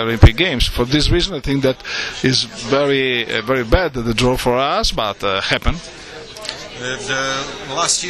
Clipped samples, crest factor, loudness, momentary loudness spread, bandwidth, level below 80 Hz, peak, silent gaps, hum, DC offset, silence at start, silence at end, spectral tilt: 0.2%; 18 dB; -17 LUFS; 12 LU; 13.5 kHz; -26 dBFS; 0 dBFS; none; none; under 0.1%; 0 s; 0 s; -4 dB/octave